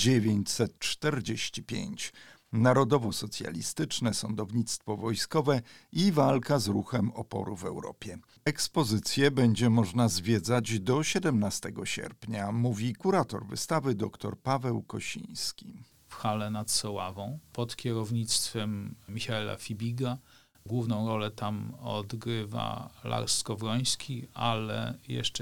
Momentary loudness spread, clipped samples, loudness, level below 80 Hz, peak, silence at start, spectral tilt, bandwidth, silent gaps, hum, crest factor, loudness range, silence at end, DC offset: 11 LU; under 0.1%; -30 LUFS; -62 dBFS; -10 dBFS; 0 s; -5 dB/octave; 18.5 kHz; none; none; 20 dB; 6 LU; 0 s; 0.2%